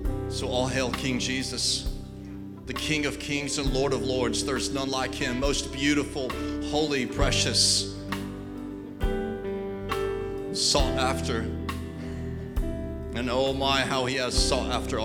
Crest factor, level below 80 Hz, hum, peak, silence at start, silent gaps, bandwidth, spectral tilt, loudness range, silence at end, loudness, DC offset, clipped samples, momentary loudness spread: 18 dB; -36 dBFS; none; -8 dBFS; 0 s; none; 18.5 kHz; -3.5 dB/octave; 3 LU; 0 s; -27 LUFS; under 0.1%; under 0.1%; 12 LU